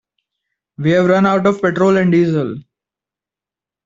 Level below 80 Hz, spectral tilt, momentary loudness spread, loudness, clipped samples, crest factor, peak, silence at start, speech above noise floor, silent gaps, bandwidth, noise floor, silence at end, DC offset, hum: -56 dBFS; -7.5 dB/octave; 9 LU; -14 LUFS; under 0.1%; 14 dB; -2 dBFS; 0.8 s; 75 dB; none; 7.6 kHz; -88 dBFS; 1.25 s; under 0.1%; none